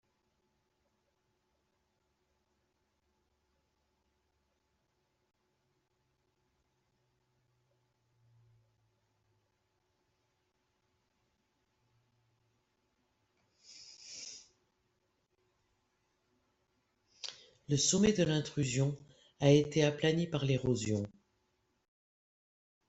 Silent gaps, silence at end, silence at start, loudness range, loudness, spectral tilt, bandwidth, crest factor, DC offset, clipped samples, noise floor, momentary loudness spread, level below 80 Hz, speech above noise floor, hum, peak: none; 1.8 s; 13.7 s; 23 LU; -31 LUFS; -5 dB/octave; 8.2 kHz; 26 dB; under 0.1%; under 0.1%; -80 dBFS; 20 LU; -68 dBFS; 49 dB; none; -14 dBFS